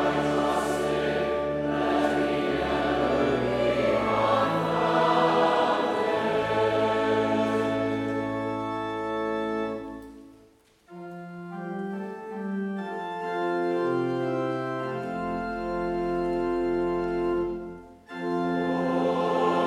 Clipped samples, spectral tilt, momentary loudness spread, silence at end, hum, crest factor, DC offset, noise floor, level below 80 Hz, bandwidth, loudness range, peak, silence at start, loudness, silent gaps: under 0.1%; -6 dB/octave; 12 LU; 0 s; none; 16 dB; under 0.1%; -58 dBFS; -52 dBFS; 14 kHz; 10 LU; -10 dBFS; 0 s; -26 LUFS; none